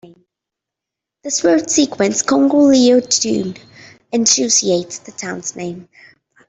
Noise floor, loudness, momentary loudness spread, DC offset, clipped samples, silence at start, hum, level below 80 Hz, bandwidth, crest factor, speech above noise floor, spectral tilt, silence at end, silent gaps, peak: -84 dBFS; -14 LUFS; 17 LU; under 0.1%; under 0.1%; 1.25 s; none; -60 dBFS; 8.4 kHz; 16 dB; 68 dB; -3 dB/octave; 0.65 s; none; 0 dBFS